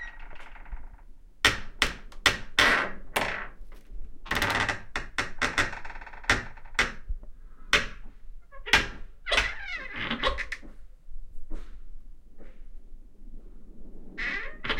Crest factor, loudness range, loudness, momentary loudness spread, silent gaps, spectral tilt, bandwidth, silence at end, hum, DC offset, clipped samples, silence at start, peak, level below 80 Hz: 28 dB; 10 LU; -27 LUFS; 23 LU; none; -2 dB/octave; 16.5 kHz; 0 s; none; under 0.1%; under 0.1%; 0 s; -4 dBFS; -40 dBFS